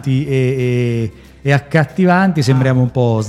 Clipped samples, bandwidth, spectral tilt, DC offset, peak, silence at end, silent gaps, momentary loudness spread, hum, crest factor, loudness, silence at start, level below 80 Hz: under 0.1%; 11.5 kHz; -7.5 dB/octave; under 0.1%; 0 dBFS; 0 s; none; 7 LU; none; 14 dB; -15 LUFS; 0 s; -44 dBFS